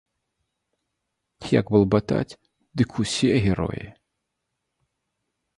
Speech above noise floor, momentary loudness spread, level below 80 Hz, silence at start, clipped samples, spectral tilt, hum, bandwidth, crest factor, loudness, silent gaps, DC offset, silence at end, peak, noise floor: 58 dB; 17 LU; -46 dBFS; 1.4 s; under 0.1%; -6 dB/octave; none; 11.5 kHz; 22 dB; -23 LUFS; none; under 0.1%; 1.65 s; -4 dBFS; -80 dBFS